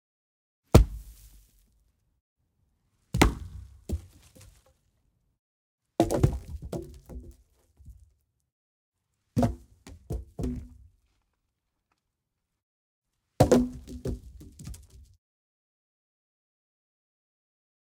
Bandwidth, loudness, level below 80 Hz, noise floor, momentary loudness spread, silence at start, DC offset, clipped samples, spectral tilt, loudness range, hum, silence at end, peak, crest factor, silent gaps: 17.5 kHz; -28 LUFS; -38 dBFS; -83 dBFS; 24 LU; 0.75 s; under 0.1%; under 0.1%; -6.5 dB/octave; 12 LU; none; 3.15 s; 0 dBFS; 32 dB; 2.21-2.36 s, 5.39-5.78 s, 8.52-8.92 s, 12.63-13.02 s